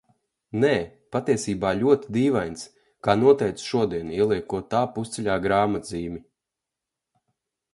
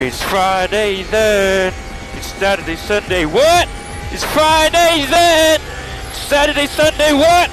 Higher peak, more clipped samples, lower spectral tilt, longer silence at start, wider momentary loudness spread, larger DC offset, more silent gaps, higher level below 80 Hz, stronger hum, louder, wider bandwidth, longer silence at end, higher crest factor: about the same, -4 dBFS vs -2 dBFS; neither; first, -6 dB/octave vs -3 dB/octave; first, 0.55 s vs 0 s; about the same, 13 LU vs 15 LU; neither; neither; second, -54 dBFS vs -30 dBFS; neither; second, -24 LUFS vs -13 LUFS; second, 11.5 kHz vs 14 kHz; first, 1.55 s vs 0 s; first, 20 dB vs 12 dB